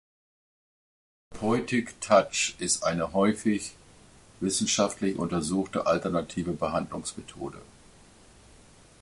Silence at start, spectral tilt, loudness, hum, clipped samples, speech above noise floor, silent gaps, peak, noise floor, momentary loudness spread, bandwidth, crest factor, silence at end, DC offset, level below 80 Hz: 1.3 s; -4 dB/octave; -27 LUFS; none; under 0.1%; 27 dB; none; -8 dBFS; -54 dBFS; 13 LU; 11.5 kHz; 22 dB; 1.35 s; under 0.1%; -56 dBFS